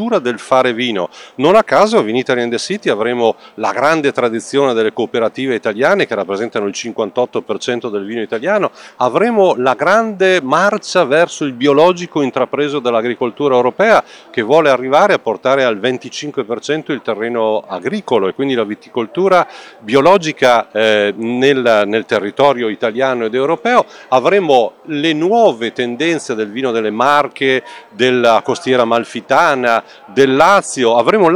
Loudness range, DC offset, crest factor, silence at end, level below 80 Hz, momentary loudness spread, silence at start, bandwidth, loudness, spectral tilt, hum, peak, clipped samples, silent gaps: 4 LU; under 0.1%; 14 dB; 0 s; -60 dBFS; 8 LU; 0 s; 12.5 kHz; -14 LUFS; -4.5 dB/octave; none; 0 dBFS; 0.3%; none